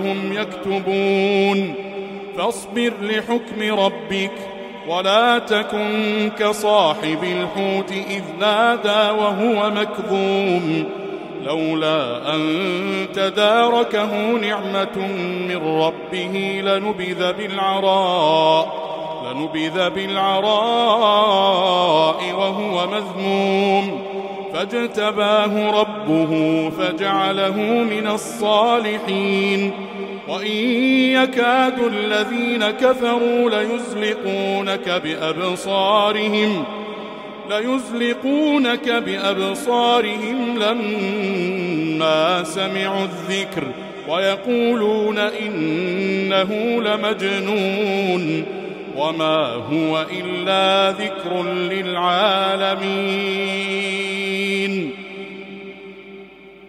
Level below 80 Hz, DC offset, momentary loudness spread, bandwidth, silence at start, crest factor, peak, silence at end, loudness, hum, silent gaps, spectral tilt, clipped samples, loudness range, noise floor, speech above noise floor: -62 dBFS; under 0.1%; 9 LU; 15.5 kHz; 0 s; 18 dB; -2 dBFS; 0 s; -19 LUFS; none; none; -5 dB/octave; under 0.1%; 3 LU; -41 dBFS; 22 dB